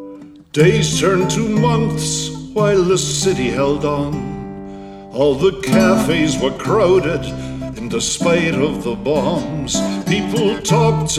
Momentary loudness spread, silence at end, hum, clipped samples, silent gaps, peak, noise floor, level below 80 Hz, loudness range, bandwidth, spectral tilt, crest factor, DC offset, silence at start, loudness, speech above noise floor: 12 LU; 0 s; none; under 0.1%; none; 0 dBFS; -36 dBFS; -38 dBFS; 2 LU; 15 kHz; -5 dB/octave; 16 dB; under 0.1%; 0 s; -16 LUFS; 21 dB